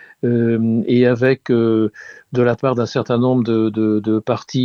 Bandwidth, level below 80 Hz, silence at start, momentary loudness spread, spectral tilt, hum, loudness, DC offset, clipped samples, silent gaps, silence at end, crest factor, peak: 7 kHz; -58 dBFS; 0.25 s; 5 LU; -8 dB/octave; none; -17 LUFS; under 0.1%; under 0.1%; none; 0 s; 14 dB; -2 dBFS